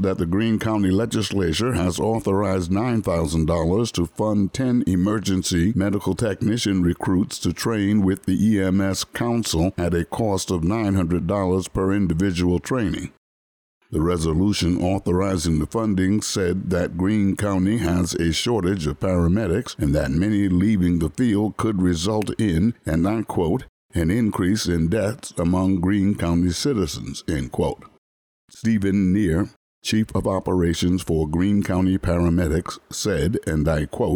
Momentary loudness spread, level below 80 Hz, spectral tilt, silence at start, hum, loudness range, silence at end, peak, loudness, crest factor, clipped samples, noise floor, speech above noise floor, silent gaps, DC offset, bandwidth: 4 LU; -38 dBFS; -6 dB/octave; 0 s; none; 2 LU; 0 s; -10 dBFS; -22 LUFS; 10 dB; under 0.1%; under -90 dBFS; over 69 dB; 13.17-13.81 s, 23.69-23.89 s, 27.98-28.48 s, 29.56-29.82 s; under 0.1%; 19.5 kHz